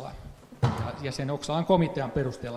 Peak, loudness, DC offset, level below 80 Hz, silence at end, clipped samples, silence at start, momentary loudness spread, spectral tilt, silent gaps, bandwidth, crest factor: -8 dBFS; -28 LUFS; under 0.1%; -50 dBFS; 0 s; under 0.1%; 0 s; 17 LU; -6.5 dB/octave; none; 13 kHz; 20 dB